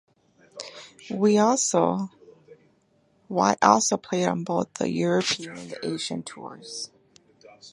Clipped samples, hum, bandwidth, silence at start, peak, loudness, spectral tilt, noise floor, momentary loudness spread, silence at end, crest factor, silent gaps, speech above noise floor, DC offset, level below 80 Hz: under 0.1%; none; 11.5 kHz; 0.55 s; -2 dBFS; -24 LUFS; -4 dB/octave; -65 dBFS; 20 LU; 0.05 s; 24 dB; none; 41 dB; under 0.1%; -68 dBFS